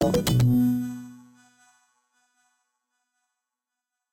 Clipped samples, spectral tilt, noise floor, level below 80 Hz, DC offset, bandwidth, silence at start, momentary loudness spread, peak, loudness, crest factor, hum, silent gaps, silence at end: under 0.1%; -6.5 dB/octave; -87 dBFS; -48 dBFS; under 0.1%; 16.5 kHz; 0 s; 20 LU; -12 dBFS; -23 LUFS; 16 dB; none; none; 2.95 s